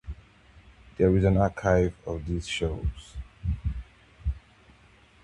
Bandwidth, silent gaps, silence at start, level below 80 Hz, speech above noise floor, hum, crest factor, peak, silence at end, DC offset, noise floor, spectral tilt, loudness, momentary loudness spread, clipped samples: 10.5 kHz; none; 0.05 s; -36 dBFS; 32 dB; none; 20 dB; -8 dBFS; 0.85 s; under 0.1%; -57 dBFS; -7 dB/octave; -27 LUFS; 21 LU; under 0.1%